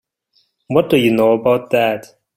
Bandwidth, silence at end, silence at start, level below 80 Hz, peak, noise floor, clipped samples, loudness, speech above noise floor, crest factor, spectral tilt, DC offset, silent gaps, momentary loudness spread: 16.5 kHz; 0.35 s; 0.7 s; -54 dBFS; -2 dBFS; -62 dBFS; under 0.1%; -15 LUFS; 48 dB; 16 dB; -6.5 dB/octave; under 0.1%; none; 6 LU